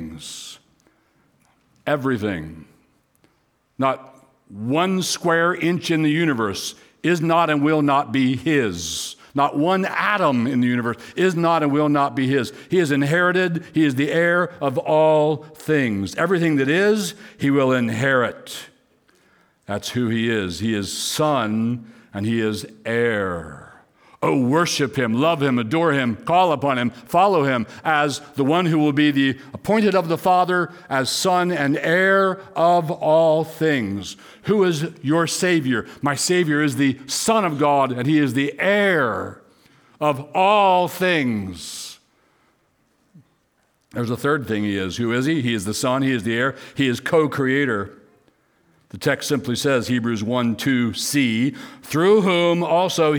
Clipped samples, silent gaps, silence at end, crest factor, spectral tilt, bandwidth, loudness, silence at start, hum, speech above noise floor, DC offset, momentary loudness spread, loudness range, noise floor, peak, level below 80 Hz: under 0.1%; none; 0 s; 16 dB; -5 dB/octave; over 20 kHz; -20 LUFS; 0 s; none; 46 dB; under 0.1%; 9 LU; 5 LU; -65 dBFS; -4 dBFS; -60 dBFS